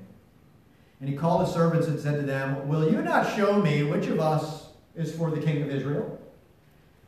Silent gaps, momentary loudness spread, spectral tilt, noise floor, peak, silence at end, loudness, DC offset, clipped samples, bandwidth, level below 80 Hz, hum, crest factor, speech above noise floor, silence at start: none; 13 LU; -7.5 dB/octave; -58 dBFS; -10 dBFS; 0.75 s; -26 LUFS; under 0.1%; under 0.1%; 14 kHz; -62 dBFS; none; 18 dB; 33 dB; 0 s